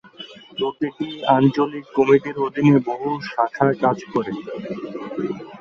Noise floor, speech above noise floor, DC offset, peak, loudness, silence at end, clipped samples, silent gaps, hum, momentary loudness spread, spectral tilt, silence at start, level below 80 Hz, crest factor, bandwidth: -41 dBFS; 21 dB; under 0.1%; -2 dBFS; -21 LUFS; 0 s; under 0.1%; none; none; 14 LU; -8 dB/octave; 0.2 s; -60 dBFS; 18 dB; 7 kHz